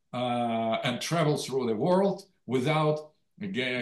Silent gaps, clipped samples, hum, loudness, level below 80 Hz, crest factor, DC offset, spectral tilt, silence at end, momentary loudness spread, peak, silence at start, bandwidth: none; under 0.1%; none; -28 LUFS; -74 dBFS; 16 dB; under 0.1%; -5.5 dB/octave; 0 s; 9 LU; -14 dBFS; 0.15 s; 12.5 kHz